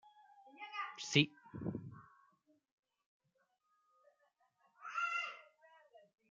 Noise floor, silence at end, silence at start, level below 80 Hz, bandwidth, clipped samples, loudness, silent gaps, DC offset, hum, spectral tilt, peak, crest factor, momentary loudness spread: -81 dBFS; 0.3 s; 0.05 s; -78 dBFS; 9 kHz; under 0.1%; -39 LUFS; 2.72-2.83 s, 3.06-3.20 s; under 0.1%; none; -4 dB/octave; -12 dBFS; 32 dB; 22 LU